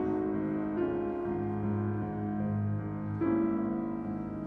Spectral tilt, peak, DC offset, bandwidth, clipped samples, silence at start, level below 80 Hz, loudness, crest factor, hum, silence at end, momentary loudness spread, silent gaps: -11.5 dB/octave; -20 dBFS; under 0.1%; 3.6 kHz; under 0.1%; 0 s; -56 dBFS; -33 LUFS; 12 dB; none; 0 s; 6 LU; none